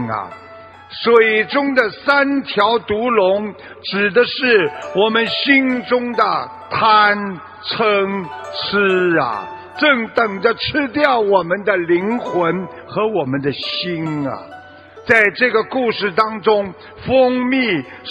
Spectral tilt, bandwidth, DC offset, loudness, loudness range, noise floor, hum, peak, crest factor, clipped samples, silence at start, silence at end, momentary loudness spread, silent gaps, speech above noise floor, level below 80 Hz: -6.5 dB/octave; 8.6 kHz; under 0.1%; -16 LUFS; 3 LU; -39 dBFS; none; 0 dBFS; 16 dB; under 0.1%; 0 s; 0 s; 12 LU; none; 23 dB; -54 dBFS